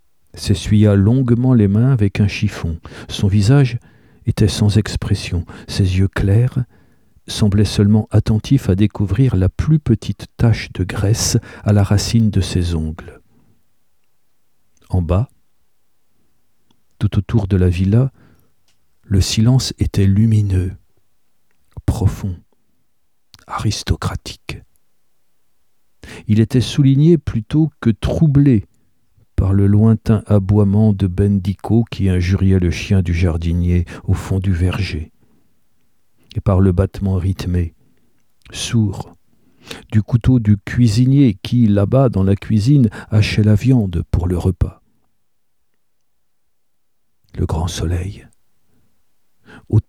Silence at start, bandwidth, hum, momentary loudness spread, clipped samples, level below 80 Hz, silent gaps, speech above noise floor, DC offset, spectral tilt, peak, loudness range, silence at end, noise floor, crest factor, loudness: 0.35 s; 14 kHz; none; 13 LU; under 0.1%; -32 dBFS; none; 59 dB; 0.2%; -7 dB/octave; 0 dBFS; 11 LU; 0.05 s; -74 dBFS; 16 dB; -16 LUFS